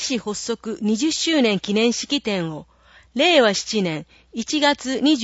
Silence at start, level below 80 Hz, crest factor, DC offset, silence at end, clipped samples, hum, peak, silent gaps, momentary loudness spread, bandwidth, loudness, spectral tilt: 0 s; -58 dBFS; 18 dB; under 0.1%; 0 s; under 0.1%; none; -4 dBFS; none; 14 LU; 8 kHz; -20 LUFS; -3.5 dB/octave